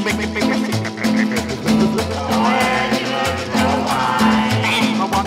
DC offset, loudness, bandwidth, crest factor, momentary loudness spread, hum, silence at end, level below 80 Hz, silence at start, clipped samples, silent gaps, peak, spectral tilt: under 0.1%; -17 LUFS; 16 kHz; 14 dB; 4 LU; none; 0 s; -40 dBFS; 0 s; under 0.1%; none; -4 dBFS; -4.5 dB/octave